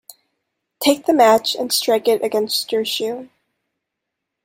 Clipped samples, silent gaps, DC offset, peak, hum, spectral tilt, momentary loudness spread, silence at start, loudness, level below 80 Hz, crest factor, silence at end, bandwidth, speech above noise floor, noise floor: under 0.1%; none; under 0.1%; -2 dBFS; none; -2 dB/octave; 9 LU; 0.8 s; -17 LUFS; -68 dBFS; 18 dB; 1.2 s; 16.5 kHz; 63 dB; -80 dBFS